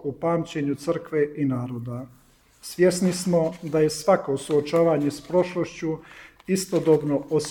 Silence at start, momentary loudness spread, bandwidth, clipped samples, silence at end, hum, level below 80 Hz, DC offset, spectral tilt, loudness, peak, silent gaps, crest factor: 0 s; 13 LU; 18.5 kHz; under 0.1%; 0 s; none; -58 dBFS; under 0.1%; -6 dB/octave; -24 LUFS; -6 dBFS; none; 18 dB